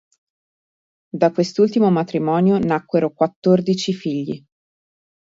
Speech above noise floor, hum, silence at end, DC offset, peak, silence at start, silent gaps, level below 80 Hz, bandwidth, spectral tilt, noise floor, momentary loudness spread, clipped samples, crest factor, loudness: over 72 dB; none; 0.95 s; under 0.1%; -2 dBFS; 1.15 s; 3.36-3.42 s; -60 dBFS; 7.8 kHz; -7 dB/octave; under -90 dBFS; 9 LU; under 0.1%; 18 dB; -18 LUFS